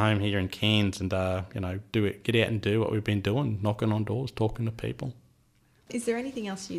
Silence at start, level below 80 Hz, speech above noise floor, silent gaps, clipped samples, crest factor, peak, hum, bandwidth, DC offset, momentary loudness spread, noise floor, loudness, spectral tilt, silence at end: 0 s; -54 dBFS; 36 dB; none; under 0.1%; 20 dB; -8 dBFS; none; 13 kHz; under 0.1%; 9 LU; -64 dBFS; -29 LUFS; -6 dB/octave; 0 s